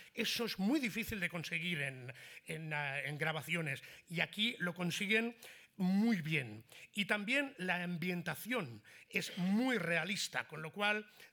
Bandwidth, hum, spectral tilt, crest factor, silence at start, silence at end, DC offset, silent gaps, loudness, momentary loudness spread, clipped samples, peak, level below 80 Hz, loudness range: over 20 kHz; none; -4.5 dB/octave; 22 dB; 0 s; 0.05 s; under 0.1%; none; -37 LUFS; 12 LU; under 0.1%; -16 dBFS; -74 dBFS; 3 LU